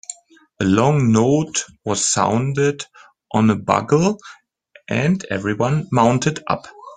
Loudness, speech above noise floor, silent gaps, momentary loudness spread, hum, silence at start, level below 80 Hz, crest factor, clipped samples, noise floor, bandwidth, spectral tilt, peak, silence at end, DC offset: -18 LUFS; 29 dB; none; 9 LU; none; 0.1 s; -52 dBFS; 18 dB; under 0.1%; -46 dBFS; 9.6 kHz; -5.5 dB/octave; -2 dBFS; 0 s; under 0.1%